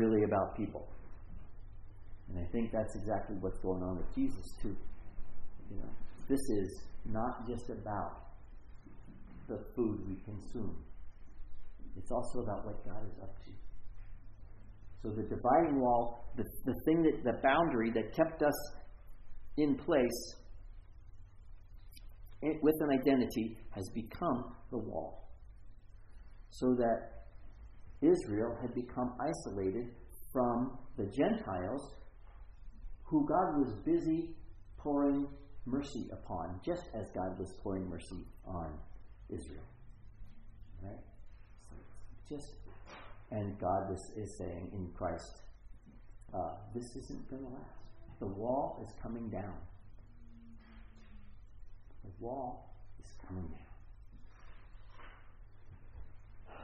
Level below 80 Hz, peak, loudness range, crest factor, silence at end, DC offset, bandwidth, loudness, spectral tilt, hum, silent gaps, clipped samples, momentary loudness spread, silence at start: -50 dBFS; -16 dBFS; 16 LU; 22 dB; 0 s; under 0.1%; 9.4 kHz; -37 LUFS; -7 dB/octave; none; none; under 0.1%; 26 LU; 0 s